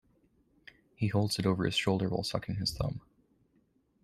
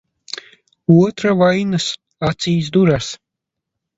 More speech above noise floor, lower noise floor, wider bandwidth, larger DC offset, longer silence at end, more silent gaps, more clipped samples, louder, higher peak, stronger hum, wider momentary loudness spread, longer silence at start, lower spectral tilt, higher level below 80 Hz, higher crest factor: second, 40 dB vs 66 dB; second, -71 dBFS vs -81 dBFS; first, 13.5 kHz vs 8 kHz; neither; first, 1.05 s vs 0.8 s; neither; neither; second, -32 LUFS vs -16 LUFS; second, -14 dBFS vs 0 dBFS; neither; second, 7 LU vs 18 LU; about the same, 1 s vs 0.9 s; about the same, -5.5 dB/octave vs -6 dB/octave; second, -54 dBFS vs -48 dBFS; about the same, 20 dB vs 18 dB